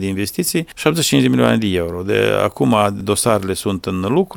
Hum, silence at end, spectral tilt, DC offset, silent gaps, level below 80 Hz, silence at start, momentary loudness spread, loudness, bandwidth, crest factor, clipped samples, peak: none; 0 s; -4.5 dB/octave; under 0.1%; none; -46 dBFS; 0 s; 7 LU; -17 LUFS; 19 kHz; 16 dB; under 0.1%; 0 dBFS